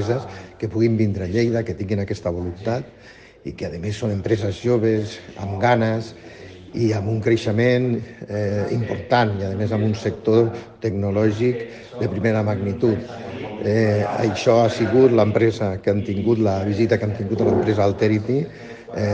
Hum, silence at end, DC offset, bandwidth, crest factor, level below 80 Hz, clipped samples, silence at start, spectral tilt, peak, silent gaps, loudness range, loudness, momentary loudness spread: none; 0 s; under 0.1%; 8.4 kHz; 18 dB; -54 dBFS; under 0.1%; 0 s; -7.5 dB/octave; -2 dBFS; none; 6 LU; -21 LUFS; 13 LU